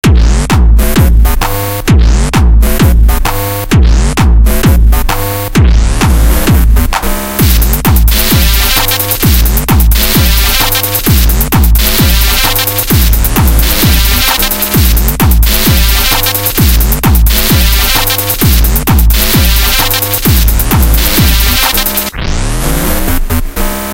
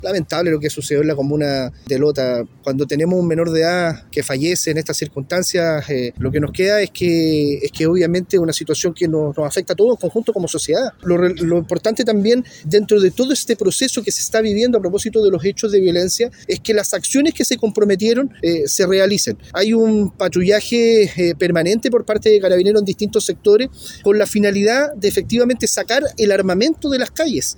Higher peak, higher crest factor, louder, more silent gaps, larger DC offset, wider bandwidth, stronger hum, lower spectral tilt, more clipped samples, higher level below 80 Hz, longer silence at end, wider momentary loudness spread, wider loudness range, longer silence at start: about the same, 0 dBFS vs -2 dBFS; second, 6 dB vs 14 dB; first, -8 LUFS vs -17 LUFS; neither; neither; second, 17.5 kHz vs 19.5 kHz; neither; about the same, -4 dB/octave vs -4.5 dB/octave; first, 2% vs under 0.1%; first, -10 dBFS vs -46 dBFS; about the same, 0 s vs 0.05 s; about the same, 5 LU vs 6 LU; about the same, 2 LU vs 3 LU; about the same, 0.05 s vs 0 s